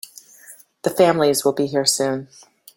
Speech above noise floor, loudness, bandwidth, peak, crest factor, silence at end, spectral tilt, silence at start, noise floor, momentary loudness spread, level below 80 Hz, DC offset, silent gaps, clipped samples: 28 dB; -19 LUFS; 17 kHz; -2 dBFS; 18 dB; 0.5 s; -3.5 dB/octave; 0.5 s; -46 dBFS; 12 LU; -64 dBFS; under 0.1%; none; under 0.1%